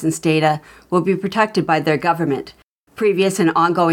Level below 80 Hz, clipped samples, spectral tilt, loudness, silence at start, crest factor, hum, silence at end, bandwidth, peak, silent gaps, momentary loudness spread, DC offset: -58 dBFS; under 0.1%; -5.5 dB/octave; -18 LUFS; 0 s; 16 dB; none; 0 s; 17 kHz; -2 dBFS; 2.63-2.87 s; 6 LU; under 0.1%